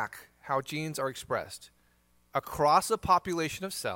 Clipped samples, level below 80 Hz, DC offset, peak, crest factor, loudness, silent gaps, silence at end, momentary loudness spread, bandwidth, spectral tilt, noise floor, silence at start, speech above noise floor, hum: under 0.1%; -58 dBFS; under 0.1%; -10 dBFS; 20 dB; -30 LUFS; none; 0 s; 13 LU; 17 kHz; -4 dB/octave; -67 dBFS; 0 s; 37 dB; none